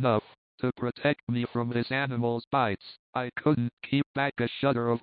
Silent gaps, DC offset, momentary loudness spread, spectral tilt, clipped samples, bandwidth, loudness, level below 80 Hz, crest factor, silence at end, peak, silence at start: 0.38-0.58 s, 1.23-1.27 s, 2.47-2.51 s, 2.99-3.13 s, 3.73-3.77 s, 4.06-4.14 s; under 0.1%; 6 LU; -11 dB/octave; under 0.1%; 5 kHz; -29 LUFS; -64 dBFS; 18 dB; 0.05 s; -12 dBFS; 0 s